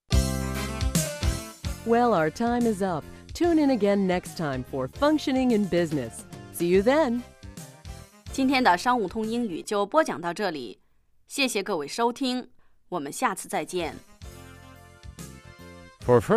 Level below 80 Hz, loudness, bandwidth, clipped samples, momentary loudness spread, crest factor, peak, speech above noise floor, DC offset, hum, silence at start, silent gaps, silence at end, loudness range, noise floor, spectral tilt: -40 dBFS; -26 LUFS; 15.5 kHz; under 0.1%; 22 LU; 18 dB; -8 dBFS; 24 dB; under 0.1%; none; 0.1 s; none; 0 s; 6 LU; -49 dBFS; -5 dB/octave